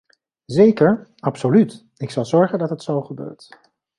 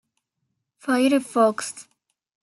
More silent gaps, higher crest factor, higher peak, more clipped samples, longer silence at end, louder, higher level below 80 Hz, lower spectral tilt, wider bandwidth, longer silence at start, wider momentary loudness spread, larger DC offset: neither; about the same, 16 dB vs 18 dB; first, -2 dBFS vs -6 dBFS; neither; about the same, 0.65 s vs 0.6 s; first, -18 LUFS vs -21 LUFS; first, -60 dBFS vs -78 dBFS; first, -8 dB/octave vs -3.5 dB/octave; second, 11 kHz vs 12.5 kHz; second, 0.5 s vs 0.85 s; first, 18 LU vs 15 LU; neither